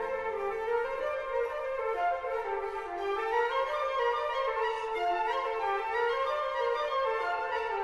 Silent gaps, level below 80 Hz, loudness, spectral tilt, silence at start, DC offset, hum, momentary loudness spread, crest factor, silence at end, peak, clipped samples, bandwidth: none; -60 dBFS; -31 LUFS; -3 dB/octave; 0 s; under 0.1%; none; 4 LU; 14 dB; 0 s; -18 dBFS; under 0.1%; 12.5 kHz